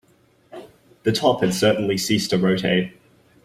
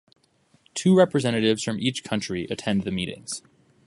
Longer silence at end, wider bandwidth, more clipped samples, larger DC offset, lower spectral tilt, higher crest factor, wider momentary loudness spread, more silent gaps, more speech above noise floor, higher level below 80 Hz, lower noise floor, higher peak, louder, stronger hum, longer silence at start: about the same, 0.55 s vs 0.45 s; first, 16 kHz vs 11.5 kHz; neither; neither; about the same, -5 dB/octave vs -5 dB/octave; about the same, 18 dB vs 20 dB; first, 19 LU vs 15 LU; neither; about the same, 39 dB vs 40 dB; about the same, -56 dBFS vs -56 dBFS; second, -58 dBFS vs -63 dBFS; about the same, -4 dBFS vs -4 dBFS; first, -20 LUFS vs -24 LUFS; neither; second, 0.55 s vs 0.75 s